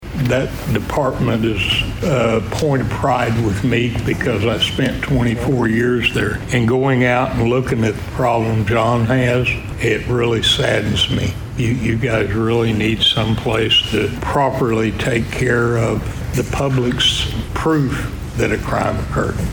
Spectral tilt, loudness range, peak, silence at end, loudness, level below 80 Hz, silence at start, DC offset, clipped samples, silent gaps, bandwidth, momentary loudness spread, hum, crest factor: -5.5 dB/octave; 2 LU; -4 dBFS; 0 s; -17 LUFS; -32 dBFS; 0 s; under 0.1%; under 0.1%; none; over 20 kHz; 6 LU; none; 14 dB